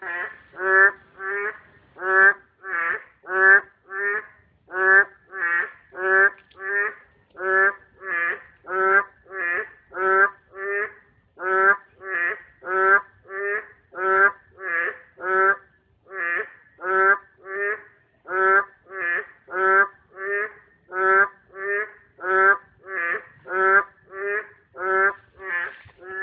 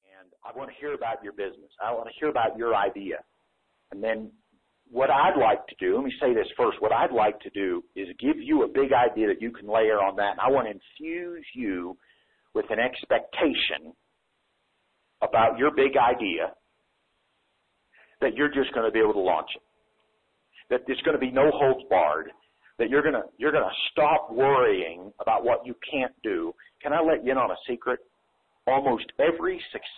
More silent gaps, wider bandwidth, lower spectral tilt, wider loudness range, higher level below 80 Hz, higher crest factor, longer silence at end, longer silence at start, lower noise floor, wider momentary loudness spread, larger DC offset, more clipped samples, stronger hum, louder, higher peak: neither; second, 3.9 kHz vs 4.3 kHz; about the same, -8 dB/octave vs -8.5 dB/octave; about the same, 3 LU vs 5 LU; second, -70 dBFS vs -58 dBFS; about the same, 20 dB vs 16 dB; about the same, 0 s vs 0 s; second, 0 s vs 0.45 s; second, -57 dBFS vs -74 dBFS; first, 16 LU vs 13 LU; neither; neither; neither; first, -21 LUFS vs -25 LUFS; first, -4 dBFS vs -10 dBFS